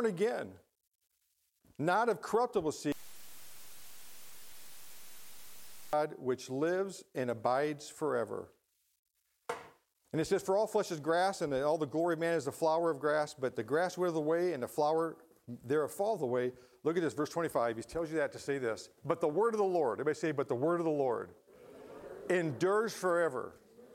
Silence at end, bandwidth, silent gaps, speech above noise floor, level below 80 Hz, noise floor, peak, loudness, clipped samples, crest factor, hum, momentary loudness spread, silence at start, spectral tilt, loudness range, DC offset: 0 s; 16.5 kHz; 0.87-0.92 s, 8.99-9.03 s; 45 dB; -72 dBFS; -79 dBFS; -14 dBFS; -34 LUFS; under 0.1%; 20 dB; none; 20 LU; 0 s; -5.5 dB/octave; 6 LU; under 0.1%